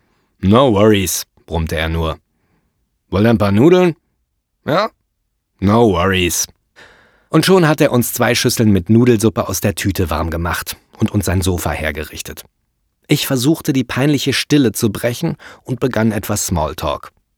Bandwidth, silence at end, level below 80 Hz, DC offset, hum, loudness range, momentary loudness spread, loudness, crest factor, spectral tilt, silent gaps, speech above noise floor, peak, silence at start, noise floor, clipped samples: over 20 kHz; 0.3 s; -36 dBFS; under 0.1%; none; 5 LU; 12 LU; -15 LUFS; 16 dB; -5 dB/octave; none; 55 dB; 0 dBFS; 0.4 s; -69 dBFS; under 0.1%